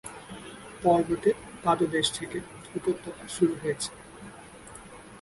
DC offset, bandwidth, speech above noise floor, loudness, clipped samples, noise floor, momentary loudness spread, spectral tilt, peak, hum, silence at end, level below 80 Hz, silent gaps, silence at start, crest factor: under 0.1%; 11.5 kHz; 20 dB; -28 LUFS; under 0.1%; -47 dBFS; 21 LU; -4.5 dB/octave; -10 dBFS; none; 0 s; -58 dBFS; none; 0.05 s; 20 dB